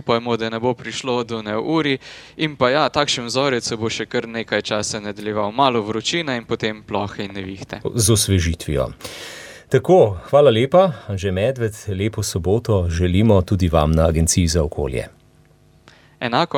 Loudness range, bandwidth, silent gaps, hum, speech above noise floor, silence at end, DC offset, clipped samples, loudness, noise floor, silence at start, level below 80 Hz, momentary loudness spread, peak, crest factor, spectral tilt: 4 LU; 17 kHz; none; none; 33 dB; 0 s; under 0.1%; under 0.1%; -19 LUFS; -52 dBFS; 0.05 s; -36 dBFS; 12 LU; -2 dBFS; 18 dB; -5 dB/octave